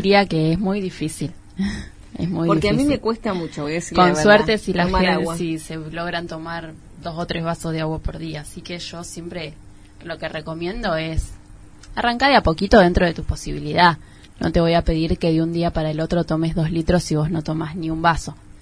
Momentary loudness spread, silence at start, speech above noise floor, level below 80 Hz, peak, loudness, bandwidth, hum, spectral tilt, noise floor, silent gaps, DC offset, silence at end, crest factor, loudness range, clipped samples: 16 LU; 0 s; 22 dB; -34 dBFS; 0 dBFS; -20 LUFS; 11 kHz; none; -6 dB/octave; -42 dBFS; none; under 0.1%; 0.05 s; 20 dB; 10 LU; under 0.1%